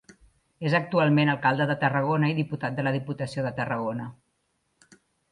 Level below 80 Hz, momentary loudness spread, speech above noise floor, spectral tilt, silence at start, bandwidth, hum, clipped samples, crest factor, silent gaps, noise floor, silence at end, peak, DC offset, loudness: -64 dBFS; 11 LU; 49 dB; -7.5 dB/octave; 0.6 s; 11 kHz; none; under 0.1%; 18 dB; none; -74 dBFS; 1.2 s; -8 dBFS; under 0.1%; -26 LUFS